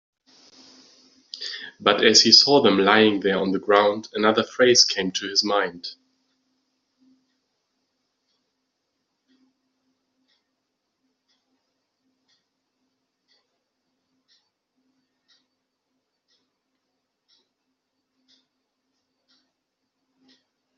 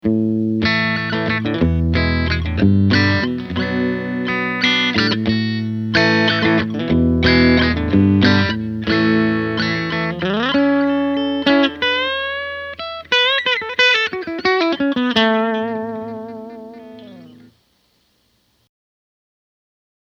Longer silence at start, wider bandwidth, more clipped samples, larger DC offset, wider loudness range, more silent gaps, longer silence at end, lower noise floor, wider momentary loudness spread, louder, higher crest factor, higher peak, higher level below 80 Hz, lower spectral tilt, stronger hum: first, 1.35 s vs 0.05 s; about the same, 7.4 kHz vs 7.2 kHz; neither; neither; first, 12 LU vs 5 LU; neither; first, 14.85 s vs 2.75 s; first, -79 dBFS vs -62 dBFS; first, 20 LU vs 9 LU; about the same, -18 LUFS vs -17 LUFS; first, 24 dB vs 18 dB; about the same, -2 dBFS vs 0 dBFS; second, -72 dBFS vs -36 dBFS; second, -1 dB/octave vs -6.5 dB/octave; neither